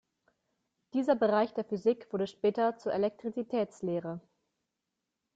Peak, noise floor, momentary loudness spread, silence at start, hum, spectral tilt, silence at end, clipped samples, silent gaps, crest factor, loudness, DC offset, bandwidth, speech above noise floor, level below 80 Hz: -16 dBFS; -86 dBFS; 9 LU; 0.95 s; none; -7 dB/octave; 1.15 s; under 0.1%; none; 18 dB; -32 LUFS; under 0.1%; 7.8 kHz; 55 dB; -76 dBFS